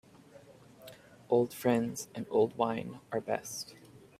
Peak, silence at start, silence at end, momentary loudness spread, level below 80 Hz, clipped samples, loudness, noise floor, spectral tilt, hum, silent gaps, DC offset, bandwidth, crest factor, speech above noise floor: -14 dBFS; 0.35 s; 0.2 s; 23 LU; -72 dBFS; under 0.1%; -33 LUFS; -56 dBFS; -5 dB/octave; none; none; under 0.1%; 16 kHz; 20 dB; 24 dB